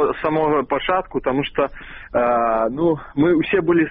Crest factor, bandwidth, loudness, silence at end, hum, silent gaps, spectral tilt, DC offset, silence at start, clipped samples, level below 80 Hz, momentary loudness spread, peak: 12 dB; 4 kHz; -19 LUFS; 0 s; none; none; -4.5 dB/octave; under 0.1%; 0 s; under 0.1%; -44 dBFS; 6 LU; -6 dBFS